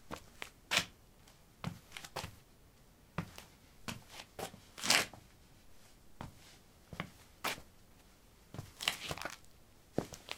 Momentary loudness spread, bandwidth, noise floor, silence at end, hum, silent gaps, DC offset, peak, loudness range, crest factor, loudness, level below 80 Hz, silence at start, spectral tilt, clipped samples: 19 LU; 18 kHz; -63 dBFS; 0 s; none; none; under 0.1%; -8 dBFS; 10 LU; 36 dB; -39 LUFS; -64 dBFS; 0 s; -2 dB/octave; under 0.1%